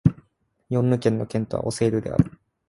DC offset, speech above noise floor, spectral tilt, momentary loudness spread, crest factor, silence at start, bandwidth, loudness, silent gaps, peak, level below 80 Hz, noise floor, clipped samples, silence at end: under 0.1%; 43 dB; -7.5 dB/octave; 6 LU; 20 dB; 0.05 s; 11.5 kHz; -24 LUFS; none; -4 dBFS; -44 dBFS; -66 dBFS; under 0.1%; 0.4 s